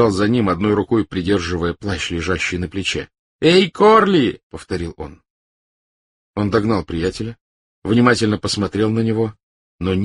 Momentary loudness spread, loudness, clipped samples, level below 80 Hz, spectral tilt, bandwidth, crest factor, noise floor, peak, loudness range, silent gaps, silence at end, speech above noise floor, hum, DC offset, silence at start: 16 LU; -18 LUFS; under 0.1%; -42 dBFS; -5.5 dB/octave; 11.5 kHz; 18 dB; under -90 dBFS; 0 dBFS; 7 LU; 3.19-3.39 s, 4.43-4.50 s, 5.30-6.34 s, 7.41-7.82 s, 9.43-9.79 s; 0 s; over 73 dB; none; under 0.1%; 0 s